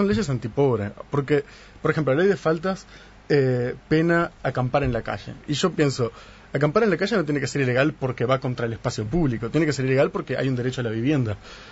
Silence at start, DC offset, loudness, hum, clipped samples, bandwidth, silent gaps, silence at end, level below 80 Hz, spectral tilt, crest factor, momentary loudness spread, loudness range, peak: 0 s; under 0.1%; -23 LUFS; none; under 0.1%; 8 kHz; none; 0 s; -46 dBFS; -6.5 dB/octave; 18 dB; 8 LU; 1 LU; -6 dBFS